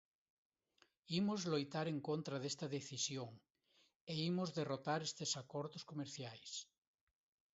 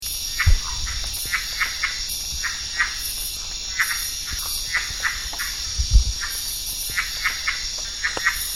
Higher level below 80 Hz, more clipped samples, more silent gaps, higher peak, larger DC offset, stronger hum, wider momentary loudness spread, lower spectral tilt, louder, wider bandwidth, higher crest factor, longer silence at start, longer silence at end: second, -84 dBFS vs -28 dBFS; neither; first, 3.96-4.07 s vs none; second, -26 dBFS vs -2 dBFS; second, under 0.1% vs 0.4%; neither; first, 9 LU vs 5 LU; first, -4.5 dB/octave vs -0.5 dB/octave; second, -43 LUFS vs -23 LUFS; second, 7.6 kHz vs 16.5 kHz; about the same, 18 dB vs 22 dB; first, 1.1 s vs 0 s; first, 0.9 s vs 0 s